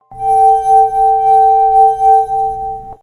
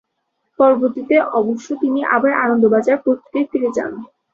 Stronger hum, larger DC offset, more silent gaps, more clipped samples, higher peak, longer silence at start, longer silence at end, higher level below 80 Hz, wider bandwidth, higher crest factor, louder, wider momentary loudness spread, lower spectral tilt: neither; neither; neither; neither; about the same, 0 dBFS vs -2 dBFS; second, 0.1 s vs 0.6 s; second, 0.1 s vs 0.25 s; first, -40 dBFS vs -62 dBFS; first, 10.5 kHz vs 7.8 kHz; second, 10 dB vs 16 dB; first, -10 LUFS vs -16 LUFS; about the same, 9 LU vs 7 LU; second, -5 dB/octave vs -6.5 dB/octave